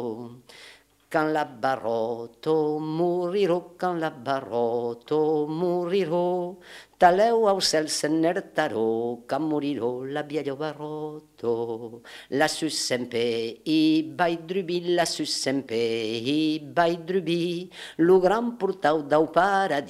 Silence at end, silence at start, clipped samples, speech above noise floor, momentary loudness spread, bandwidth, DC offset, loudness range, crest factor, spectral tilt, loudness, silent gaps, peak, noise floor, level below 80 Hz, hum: 0 s; 0 s; under 0.1%; 27 dB; 11 LU; 15 kHz; under 0.1%; 5 LU; 22 dB; -4.5 dB/octave; -25 LUFS; none; -4 dBFS; -52 dBFS; -64 dBFS; none